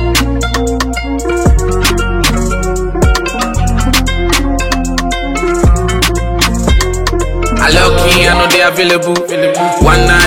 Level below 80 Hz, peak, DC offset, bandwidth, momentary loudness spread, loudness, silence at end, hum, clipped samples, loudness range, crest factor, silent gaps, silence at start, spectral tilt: -16 dBFS; 0 dBFS; under 0.1%; 17 kHz; 7 LU; -11 LUFS; 0 s; none; 0.2%; 3 LU; 10 dB; none; 0 s; -4 dB/octave